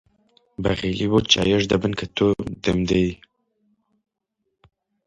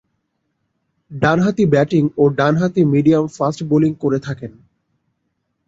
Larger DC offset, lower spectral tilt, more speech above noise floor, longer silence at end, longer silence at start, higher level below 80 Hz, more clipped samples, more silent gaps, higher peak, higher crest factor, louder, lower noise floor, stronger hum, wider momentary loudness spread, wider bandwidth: neither; second, -5 dB/octave vs -8 dB/octave; about the same, 56 dB vs 55 dB; first, 1.9 s vs 1.15 s; second, 0.6 s vs 1.1 s; first, -44 dBFS vs -52 dBFS; neither; neither; about the same, 0 dBFS vs -2 dBFS; first, 22 dB vs 16 dB; second, -21 LUFS vs -16 LUFS; first, -77 dBFS vs -71 dBFS; neither; about the same, 9 LU vs 11 LU; first, 10.5 kHz vs 7.8 kHz